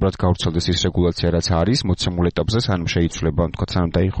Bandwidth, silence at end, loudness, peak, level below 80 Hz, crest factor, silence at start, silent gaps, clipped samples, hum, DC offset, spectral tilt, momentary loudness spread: 8.8 kHz; 0 s; -20 LUFS; -6 dBFS; -32 dBFS; 12 dB; 0 s; none; under 0.1%; none; under 0.1%; -6 dB/octave; 3 LU